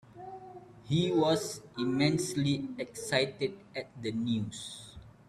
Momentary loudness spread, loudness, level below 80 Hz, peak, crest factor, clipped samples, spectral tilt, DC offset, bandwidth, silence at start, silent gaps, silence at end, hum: 19 LU; -32 LUFS; -64 dBFS; -12 dBFS; 22 dB; under 0.1%; -5 dB/octave; under 0.1%; 13.5 kHz; 0.15 s; none; 0.2 s; none